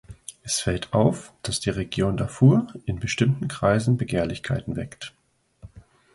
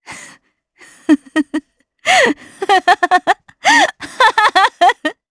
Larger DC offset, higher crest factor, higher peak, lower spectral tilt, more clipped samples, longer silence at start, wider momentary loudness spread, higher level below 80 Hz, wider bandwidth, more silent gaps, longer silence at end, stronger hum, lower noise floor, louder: neither; first, 20 dB vs 14 dB; second, -4 dBFS vs 0 dBFS; first, -5.5 dB/octave vs -1.5 dB/octave; neither; about the same, 0.1 s vs 0.1 s; about the same, 14 LU vs 12 LU; first, -46 dBFS vs -58 dBFS; about the same, 11.5 kHz vs 11 kHz; neither; first, 0.35 s vs 0.2 s; neither; about the same, -49 dBFS vs -50 dBFS; second, -24 LUFS vs -13 LUFS